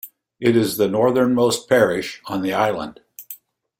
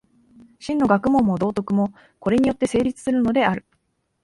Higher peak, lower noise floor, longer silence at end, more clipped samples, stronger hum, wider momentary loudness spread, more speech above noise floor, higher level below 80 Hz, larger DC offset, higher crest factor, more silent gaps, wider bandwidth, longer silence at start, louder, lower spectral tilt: about the same, -2 dBFS vs -4 dBFS; second, -42 dBFS vs -70 dBFS; second, 0.45 s vs 0.65 s; neither; neither; first, 19 LU vs 9 LU; second, 24 dB vs 50 dB; second, -58 dBFS vs -50 dBFS; neither; about the same, 18 dB vs 18 dB; neither; first, 16.5 kHz vs 11.5 kHz; second, 0.05 s vs 0.6 s; about the same, -19 LUFS vs -21 LUFS; second, -5 dB/octave vs -7 dB/octave